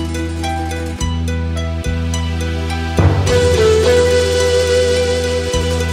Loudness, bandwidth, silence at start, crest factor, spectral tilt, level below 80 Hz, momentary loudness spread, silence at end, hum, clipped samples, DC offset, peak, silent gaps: -16 LUFS; 15.5 kHz; 0 s; 14 dB; -5 dB/octave; -24 dBFS; 9 LU; 0 s; none; under 0.1%; under 0.1%; 0 dBFS; none